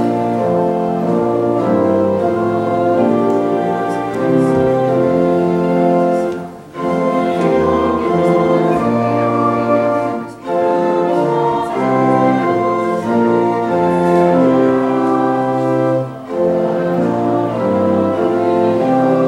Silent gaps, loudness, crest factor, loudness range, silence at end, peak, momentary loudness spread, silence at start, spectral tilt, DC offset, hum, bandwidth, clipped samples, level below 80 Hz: none; -15 LUFS; 14 dB; 2 LU; 0 s; 0 dBFS; 4 LU; 0 s; -8 dB/octave; under 0.1%; none; 11.5 kHz; under 0.1%; -50 dBFS